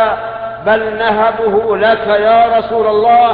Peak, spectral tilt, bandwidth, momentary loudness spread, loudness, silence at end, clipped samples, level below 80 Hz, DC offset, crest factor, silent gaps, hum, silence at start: 0 dBFS; -8 dB/octave; 4.9 kHz; 6 LU; -12 LUFS; 0 s; under 0.1%; -44 dBFS; under 0.1%; 10 dB; none; none; 0 s